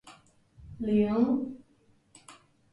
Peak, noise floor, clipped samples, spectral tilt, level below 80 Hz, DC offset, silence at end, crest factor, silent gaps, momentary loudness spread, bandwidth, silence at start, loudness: -14 dBFS; -65 dBFS; under 0.1%; -8 dB/octave; -58 dBFS; under 0.1%; 0.4 s; 18 dB; none; 24 LU; 11.5 kHz; 0.05 s; -28 LUFS